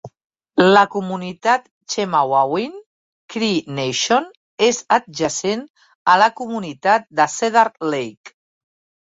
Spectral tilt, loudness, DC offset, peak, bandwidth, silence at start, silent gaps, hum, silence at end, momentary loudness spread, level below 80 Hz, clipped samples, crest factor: -3.5 dB/octave; -18 LUFS; under 0.1%; 0 dBFS; 8 kHz; 0.05 s; 0.24-0.30 s, 1.71-1.81 s, 2.86-3.28 s, 4.37-4.58 s, 5.70-5.74 s, 5.95-6.05 s, 8.17-8.24 s; none; 0.75 s; 12 LU; -62 dBFS; under 0.1%; 18 dB